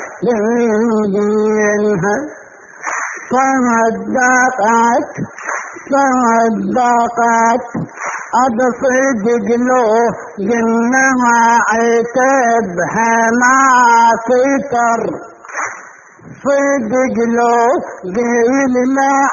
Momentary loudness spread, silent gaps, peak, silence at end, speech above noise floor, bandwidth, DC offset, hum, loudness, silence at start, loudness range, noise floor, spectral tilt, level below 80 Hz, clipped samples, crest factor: 11 LU; none; 0 dBFS; 0 s; 25 dB; 7.4 kHz; under 0.1%; none; -13 LUFS; 0 s; 4 LU; -37 dBFS; -4.5 dB/octave; -54 dBFS; under 0.1%; 12 dB